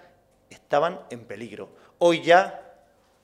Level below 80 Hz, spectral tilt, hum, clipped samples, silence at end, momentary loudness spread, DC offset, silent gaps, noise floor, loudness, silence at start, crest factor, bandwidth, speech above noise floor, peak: -72 dBFS; -4.5 dB/octave; none; under 0.1%; 0.65 s; 23 LU; under 0.1%; none; -59 dBFS; -22 LUFS; 0.7 s; 22 dB; 11.5 kHz; 36 dB; -2 dBFS